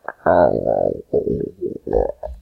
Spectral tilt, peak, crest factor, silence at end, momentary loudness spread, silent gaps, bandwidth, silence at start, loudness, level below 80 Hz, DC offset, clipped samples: -10 dB/octave; -2 dBFS; 18 dB; 0 s; 10 LU; none; 4.7 kHz; 0.1 s; -20 LUFS; -36 dBFS; under 0.1%; under 0.1%